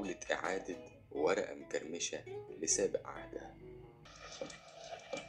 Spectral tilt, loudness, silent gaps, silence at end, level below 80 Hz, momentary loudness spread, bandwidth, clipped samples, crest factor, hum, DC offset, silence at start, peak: -2 dB/octave; -39 LUFS; none; 0 s; -66 dBFS; 19 LU; 12 kHz; under 0.1%; 22 dB; none; under 0.1%; 0 s; -18 dBFS